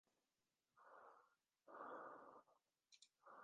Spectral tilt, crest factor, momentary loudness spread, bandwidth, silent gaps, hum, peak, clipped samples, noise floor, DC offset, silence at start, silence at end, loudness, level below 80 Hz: -1.5 dB/octave; 20 dB; 13 LU; 7.2 kHz; none; none; -44 dBFS; under 0.1%; under -90 dBFS; under 0.1%; 0.75 s; 0 s; -61 LUFS; under -90 dBFS